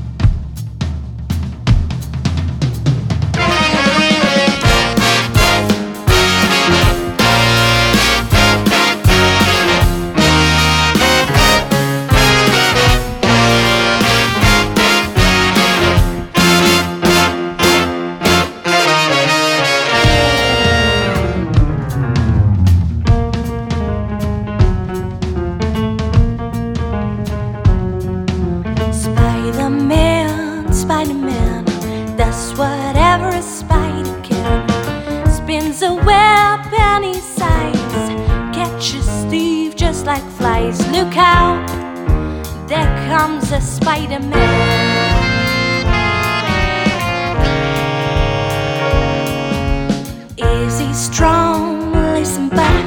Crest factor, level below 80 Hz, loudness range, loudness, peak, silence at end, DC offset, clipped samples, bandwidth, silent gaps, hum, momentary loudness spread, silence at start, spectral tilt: 14 dB; -22 dBFS; 6 LU; -13 LUFS; 0 dBFS; 0 s; under 0.1%; under 0.1%; over 20 kHz; none; none; 9 LU; 0 s; -4.5 dB/octave